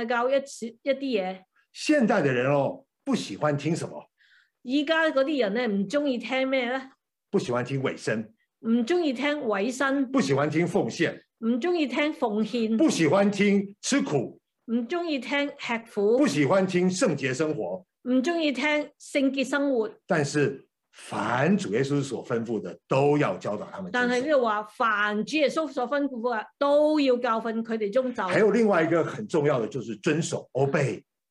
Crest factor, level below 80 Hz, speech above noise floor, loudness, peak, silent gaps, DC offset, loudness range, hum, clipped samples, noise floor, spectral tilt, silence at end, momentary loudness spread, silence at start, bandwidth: 16 dB; -76 dBFS; 37 dB; -26 LUFS; -10 dBFS; none; under 0.1%; 3 LU; none; under 0.1%; -62 dBFS; -5.5 dB/octave; 0.3 s; 9 LU; 0 s; 12 kHz